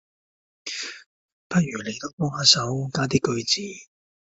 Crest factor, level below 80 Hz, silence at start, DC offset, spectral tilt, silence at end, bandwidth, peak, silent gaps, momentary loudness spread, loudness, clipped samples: 24 dB; -62 dBFS; 0.65 s; under 0.1%; -3.5 dB/octave; 0.55 s; 8.2 kHz; -2 dBFS; 1.06-1.50 s, 2.13-2.18 s; 18 LU; -23 LUFS; under 0.1%